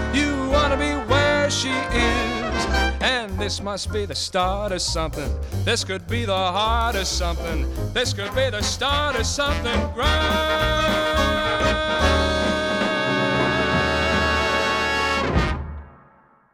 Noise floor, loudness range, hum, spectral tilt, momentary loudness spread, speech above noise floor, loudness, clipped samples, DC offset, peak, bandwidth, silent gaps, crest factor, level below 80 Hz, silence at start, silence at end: -55 dBFS; 3 LU; none; -4 dB/octave; 6 LU; 32 dB; -21 LUFS; under 0.1%; under 0.1%; -6 dBFS; 17 kHz; none; 16 dB; -30 dBFS; 0 s; 0.6 s